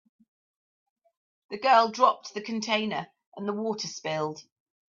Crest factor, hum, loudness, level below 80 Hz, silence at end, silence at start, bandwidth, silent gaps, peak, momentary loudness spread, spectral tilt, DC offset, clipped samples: 22 dB; none; -27 LUFS; -80 dBFS; 0.55 s; 1.5 s; 7.6 kHz; 3.27-3.32 s; -8 dBFS; 15 LU; -3.5 dB/octave; under 0.1%; under 0.1%